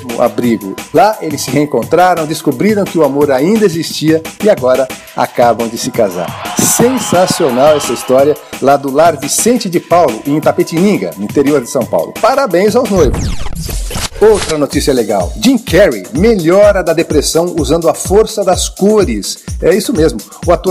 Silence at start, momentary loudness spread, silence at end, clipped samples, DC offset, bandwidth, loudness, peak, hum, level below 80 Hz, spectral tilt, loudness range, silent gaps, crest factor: 0 s; 7 LU; 0 s; 0.1%; under 0.1%; 16 kHz; -11 LUFS; 0 dBFS; none; -28 dBFS; -4.5 dB/octave; 2 LU; none; 10 dB